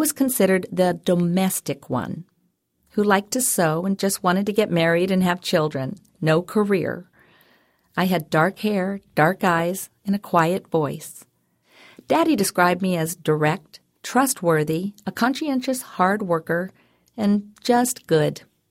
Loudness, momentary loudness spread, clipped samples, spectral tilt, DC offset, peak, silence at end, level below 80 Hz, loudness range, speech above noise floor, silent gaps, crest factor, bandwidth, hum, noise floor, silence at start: -21 LUFS; 10 LU; under 0.1%; -5 dB/octave; under 0.1%; -4 dBFS; 0.3 s; -62 dBFS; 2 LU; 47 dB; none; 18 dB; 16.5 kHz; none; -68 dBFS; 0 s